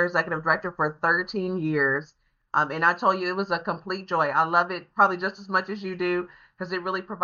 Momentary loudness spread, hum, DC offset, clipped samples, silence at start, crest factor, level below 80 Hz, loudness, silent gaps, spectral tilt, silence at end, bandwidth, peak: 9 LU; none; under 0.1%; under 0.1%; 0 s; 20 dB; -66 dBFS; -25 LUFS; none; -3.5 dB/octave; 0 s; 7.2 kHz; -6 dBFS